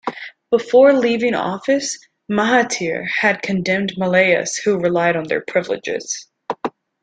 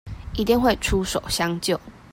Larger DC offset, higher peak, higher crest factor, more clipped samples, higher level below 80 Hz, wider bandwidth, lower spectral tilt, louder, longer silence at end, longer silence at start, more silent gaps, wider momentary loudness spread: neither; first, -2 dBFS vs -6 dBFS; about the same, 16 dB vs 16 dB; neither; second, -60 dBFS vs -36 dBFS; second, 9.4 kHz vs 16.5 kHz; about the same, -4 dB/octave vs -4.5 dB/octave; first, -18 LUFS vs -23 LUFS; first, 0.35 s vs 0.15 s; about the same, 0.05 s vs 0.05 s; neither; first, 14 LU vs 8 LU